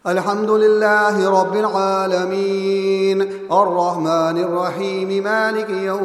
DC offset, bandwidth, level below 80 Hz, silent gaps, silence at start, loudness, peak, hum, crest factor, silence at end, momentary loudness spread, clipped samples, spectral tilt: under 0.1%; 13 kHz; -70 dBFS; none; 0.05 s; -17 LUFS; -2 dBFS; none; 16 dB; 0 s; 6 LU; under 0.1%; -5.5 dB/octave